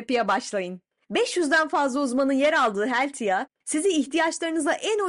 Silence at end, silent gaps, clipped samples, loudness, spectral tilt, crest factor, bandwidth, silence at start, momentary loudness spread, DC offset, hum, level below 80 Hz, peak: 0 s; none; under 0.1%; -24 LUFS; -3 dB/octave; 12 dB; 11.5 kHz; 0 s; 8 LU; under 0.1%; none; -70 dBFS; -12 dBFS